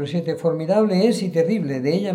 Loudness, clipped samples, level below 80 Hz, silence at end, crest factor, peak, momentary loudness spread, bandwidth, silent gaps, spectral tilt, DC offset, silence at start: -20 LUFS; under 0.1%; -70 dBFS; 0 s; 14 dB; -6 dBFS; 5 LU; 13.5 kHz; none; -7 dB/octave; under 0.1%; 0 s